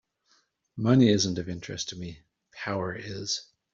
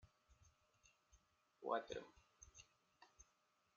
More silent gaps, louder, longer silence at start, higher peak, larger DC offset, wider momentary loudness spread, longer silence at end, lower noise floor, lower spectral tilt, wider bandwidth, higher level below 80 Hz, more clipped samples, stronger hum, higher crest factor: neither; first, -27 LUFS vs -48 LUFS; first, 0.75 s vs 0.05 s; first, -8 dBFS vs -30 dBFS; neither; second, 18 LU vs 22 LU; second, 0.3 s vs 0.55 s; second, -69 dBFS vs -82 dBFS; first, -5 dB/octave vs -2.5 dB/octave; about the same, 7.8 kHz vs 7.2 kHz; first, -62 dBFS vs -78 dBFS; neither; neither; second, 20 dB vs 26 dB